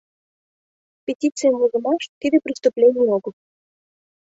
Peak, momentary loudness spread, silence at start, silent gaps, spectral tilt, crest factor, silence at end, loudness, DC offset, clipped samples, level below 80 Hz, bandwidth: -4 dBFS; 11 LU; 1.1 s; 1.15-1.19 s, 2.09-2.21 s; -4.5 dB/octave; 16 dB; 1 s; -19 LUFS; under 0.1%; under 0.1%; -68 dBFS; 8 kHz